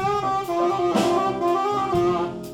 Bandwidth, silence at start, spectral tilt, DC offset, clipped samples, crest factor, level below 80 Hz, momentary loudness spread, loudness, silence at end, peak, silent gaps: 16.5 kHz; 0 s; -6 dB/octave; under 0.1%; under 0.1%; 14 dB; -52 dBFS; 3 LU; -22 LUFS; 0 s; -8 dBFS; none